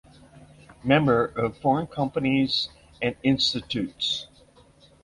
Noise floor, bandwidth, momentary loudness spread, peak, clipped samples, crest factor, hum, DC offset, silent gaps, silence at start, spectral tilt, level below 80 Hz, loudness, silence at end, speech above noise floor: -55 dBFS; 11 kHz; 9 LU; -6 dBFS; under 0.1%; 20 dB; none; under 0.1%; none; 0.35 s; -5.5 dB/octave; -54 dBFS; -25 LUFS; 0.8 s; 31 dB